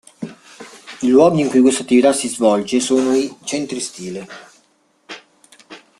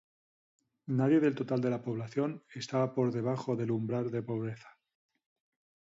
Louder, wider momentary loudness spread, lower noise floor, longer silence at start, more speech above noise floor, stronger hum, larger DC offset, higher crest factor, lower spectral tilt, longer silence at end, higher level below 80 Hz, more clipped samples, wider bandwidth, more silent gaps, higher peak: first, -16 LUFS vs -33 LUFS; first, 23 LU vs 10 LU; second, -59 dBFS vs under -90 dBFS; second, 0.2 s vs 0.85 s; second, 43 dB vs over 58 dB; neither; neither; about the same, 16 dB vs 16 dB; second, -4.5 dB/octave vs -8 dB/octave; second, 0.25 s vs 1.15 s; first, -60 dBFS vs -74 dBFS; neither; first, 12.5 kHz vs 7.8 kHz; neither; first, -2 dBFS vs -16 dBFS